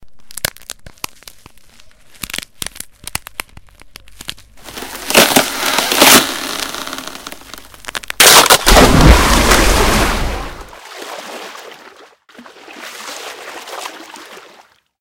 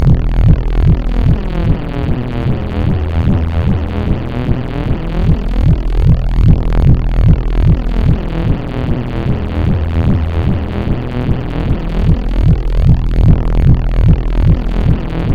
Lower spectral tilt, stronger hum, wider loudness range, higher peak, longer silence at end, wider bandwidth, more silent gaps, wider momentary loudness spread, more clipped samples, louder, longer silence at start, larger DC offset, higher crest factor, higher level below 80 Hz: second, -2.5 dB/octave vs -9.5 dB/octave; neither; first, 21 LU vs 3 LU; about the same, 0 dBFS vs 0 dBFS; first, 0.65 s vs 0 s; first, over 20 kHz vs 5.2 kHz; neither; first, 25 LU vs 6 LU; about the same, 0.5% vs 0.5%; first, -10 LUFS vs -14 LUFS; about the same, 0.05 s vs 0 s; neither; about the same, 16 dB vs 12 dB; second, -22 dBFS vs -14 dBFS